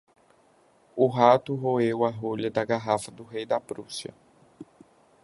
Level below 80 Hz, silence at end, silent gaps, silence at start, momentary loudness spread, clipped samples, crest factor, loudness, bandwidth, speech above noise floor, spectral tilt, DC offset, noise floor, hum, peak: -68 dBFS; 0.6 s; none; 0.95 s; 17 LU; under 0.1%; 24 dB; -26 LUFS; 11.5 kHz; 36 dB; -6 dB/octave; under 0.1%; -61 dBFS; none; -4 dBFS